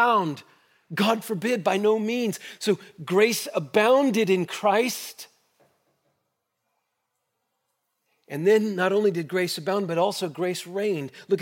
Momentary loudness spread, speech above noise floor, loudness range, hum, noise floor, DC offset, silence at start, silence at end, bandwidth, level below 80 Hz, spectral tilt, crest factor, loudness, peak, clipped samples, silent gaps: 9 LU; 55 dB; 7 LU; none; -78 dBFS; under 0.1%; 0 s; 0 s; 17 kHz; -82 dBFS; -4.5 dB/octave; 18 dB; -24 LUFS; -6 dBFS; under 0.1%; none